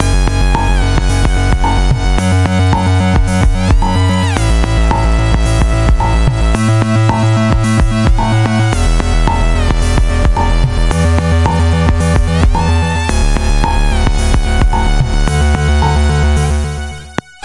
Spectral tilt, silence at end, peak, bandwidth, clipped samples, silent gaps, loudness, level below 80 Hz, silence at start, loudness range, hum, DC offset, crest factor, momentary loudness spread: -6 dB/octave; 0.25 s; 0 dBFS; 11.5 kHz; under 0.1%; none; -13 LUFS; -14 dBFS; 0 s; 1 LU; none; 2%; 10 dB; 3 LU